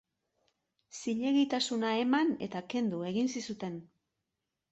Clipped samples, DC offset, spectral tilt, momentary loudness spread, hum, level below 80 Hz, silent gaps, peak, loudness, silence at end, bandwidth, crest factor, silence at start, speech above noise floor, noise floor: under 0.1%; under 0.1%; -4.5 dB/octave; 12 LU; none; -76 dBFS; none; -18 dBFS; -32 LUFS; 0.9 s; 8.2 kHz; 16 dB; 0.95 s; 55 dB; -87 dBFS